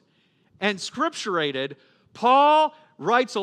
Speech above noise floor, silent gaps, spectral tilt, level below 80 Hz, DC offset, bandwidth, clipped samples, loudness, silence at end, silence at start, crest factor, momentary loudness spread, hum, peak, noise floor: 42 dB; none; -3.5 dB/octave; -78 dBFS; under 0.1%; 10.5 kHz; under 0.1%; -22 LUFS; 0 s; 0.6 s; 18 dB; 12 LU; none; -6 dBFS; -64 dBFS